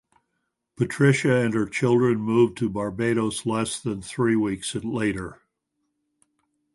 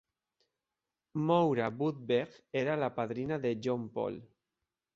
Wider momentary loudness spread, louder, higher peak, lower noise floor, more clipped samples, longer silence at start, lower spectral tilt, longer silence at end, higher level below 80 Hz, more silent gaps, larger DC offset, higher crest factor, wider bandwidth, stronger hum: about the same, 9 LU vs 9 LU; first, -23 LUFS vs -33 LUFS; first, -6 dBFS vs -16 dBFS; second, -78 dBFS vs under -90 dBFS; neither; second, 0.8 s vs 1.15 s; second, -6 dB/octave vs -7.5 dB/octave; first, 1.4 s vs 0.7 s; first, -56 dBFS vs -72 dBFS; neither; neither; about the same, 18 dB vs 18 dB; first, 11.5 kHz vs 7.4 kHz; neither